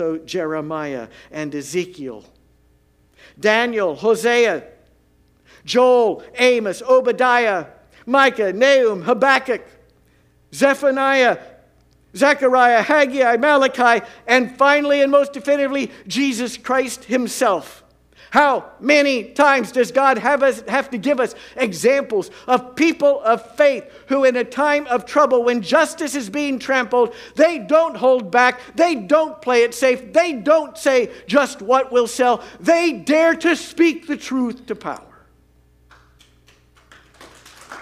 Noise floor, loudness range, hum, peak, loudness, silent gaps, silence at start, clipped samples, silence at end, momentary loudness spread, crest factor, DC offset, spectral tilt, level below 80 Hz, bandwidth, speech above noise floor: -57 dBFS; 5 LU; none; 0 dBFS; -17 LUFS; none; 0 s; under 0.1%; 0 s; 10 LU; 18 dB; under 0.1%; -3.5 dB/octave; -60 dBFS; 15.5 kHz; 40 dB